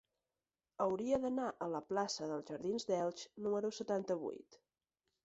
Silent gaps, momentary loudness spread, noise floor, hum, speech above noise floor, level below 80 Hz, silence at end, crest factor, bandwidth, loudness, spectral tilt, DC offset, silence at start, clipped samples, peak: none; 7 LU; under -90 dBFS; none; over 51 dB; -74 dBFS; 0.7 s; 18 dB; 8 kHz; -40 LUFS; -4.5 dB/octave; under 0.1%; 0.8 s; under 0.1%; -22 dBFS